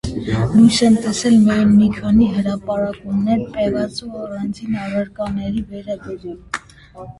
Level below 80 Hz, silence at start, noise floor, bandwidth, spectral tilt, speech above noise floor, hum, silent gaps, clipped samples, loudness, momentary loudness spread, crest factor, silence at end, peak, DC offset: -40 dBFS; 0.05 s; -38 dBFS; 11.5 kHz; -6 dB/octave; 22 dB; none; none; under 0.1%; -17 LUFS; 16 LU; 16 dB; 0.1 s; 0 dBFS; under 0.1%